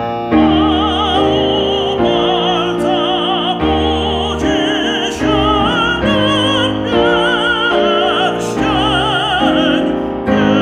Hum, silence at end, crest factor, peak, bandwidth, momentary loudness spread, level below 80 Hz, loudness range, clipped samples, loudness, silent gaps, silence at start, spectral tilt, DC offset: none; 0 s; 12 dB; -2 dBFS; 11.5 kHz; 3 LU; -32 dBFS; 1 LU; under 0.1%; -13 LUFS; none; 0 s; -5 dB/octave; under 0.1%